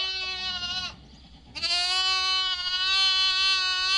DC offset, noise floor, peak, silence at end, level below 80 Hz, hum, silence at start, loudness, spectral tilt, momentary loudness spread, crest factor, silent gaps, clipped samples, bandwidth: under 0.1%; -49 dBFS; -12 dBFS; 0 s; -54 dBFS; none; 0 s; -23 LUFS; 1 dB/octave; 10 LU; 14 dB; none; under 0.1%; 11.5 kHz